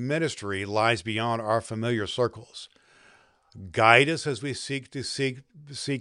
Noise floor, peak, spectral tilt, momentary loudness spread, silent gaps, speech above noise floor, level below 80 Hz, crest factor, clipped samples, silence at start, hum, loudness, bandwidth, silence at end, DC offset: -59 dBFS; -2 dBFS; -4.5 dB/octave; 22 LU; none; 32 dB; -64 dBFS; 26 dB; under 0.1%; 0 s; none; -26 LUFS; 11.5 kHz; 0 s; under 0.1%